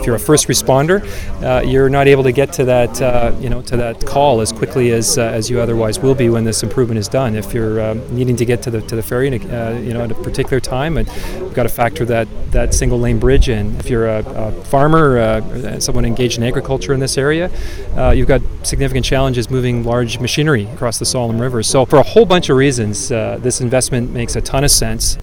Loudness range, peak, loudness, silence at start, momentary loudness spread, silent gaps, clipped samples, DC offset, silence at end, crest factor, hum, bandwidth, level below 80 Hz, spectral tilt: 5 LU; 0 dBFS; -15 LUFS; 0 s; 9 LU; none; 0.1%; 1%; 0 s; 14 dB; none; 18.5 kHz; -22 dBFS; -5 dB/octave